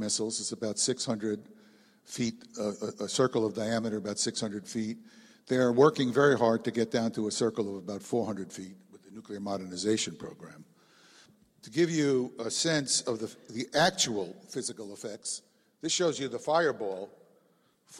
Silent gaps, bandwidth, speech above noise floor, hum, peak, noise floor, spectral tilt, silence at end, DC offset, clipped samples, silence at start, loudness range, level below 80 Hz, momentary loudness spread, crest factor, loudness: none; 14.5 kHz; 38 dB; none; -10 dBFS; -68 dBFS; -3.5 dB/octave; 0 s; under 0.1%; under 0.1%; 0 s; 7 LU; -72 dBFS; 15 LU; 20 dB; -30 LUFS